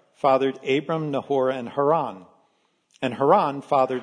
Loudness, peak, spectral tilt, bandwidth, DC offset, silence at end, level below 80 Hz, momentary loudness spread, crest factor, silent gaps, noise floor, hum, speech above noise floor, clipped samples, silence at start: -23 LUFS; -4 dBFS; -7 dB/octave; 10 kHz; under 0.1%; 0 s; -76 dBFS; 7 LU; 18 dB; none; -67 dBFS; none; 45 dB; under 0.1%; 0.25 s